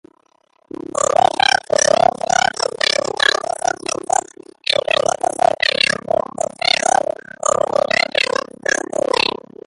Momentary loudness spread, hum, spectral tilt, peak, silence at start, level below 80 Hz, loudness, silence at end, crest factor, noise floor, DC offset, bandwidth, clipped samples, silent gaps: 7 LU; none; -1 dB/octave; 0 dBFS; 0.95 s; -56 dBFS; -17 LUFS; 0.35 s; 18 dB; -59 dBFS; under 0.1%; 11.5 kHz; under 0.1%; none